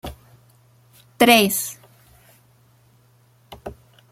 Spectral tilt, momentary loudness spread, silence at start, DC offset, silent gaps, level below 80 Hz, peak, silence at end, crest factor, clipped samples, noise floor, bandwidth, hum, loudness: -3 dB/octave; 26 LU; 0.05 s; under 0.1%; none; -52 dBFS; 0 dBFS; 0.4 s; 24 dB; under 0.1%; -56 dBFS; 16.5 kHz; none; -17 LUFS